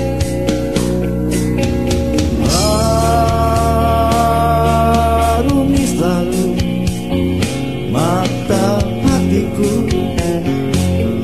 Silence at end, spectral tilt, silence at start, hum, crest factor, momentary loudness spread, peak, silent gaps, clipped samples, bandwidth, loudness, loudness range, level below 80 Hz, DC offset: 0 s; -6 dB/octave; 0 s; none; 12 dB; 4 LU; -2 dBFS; none; under 0.1%; 15.5 kHz; -15 LUFS; 3 LU; -24 dBFS; 2%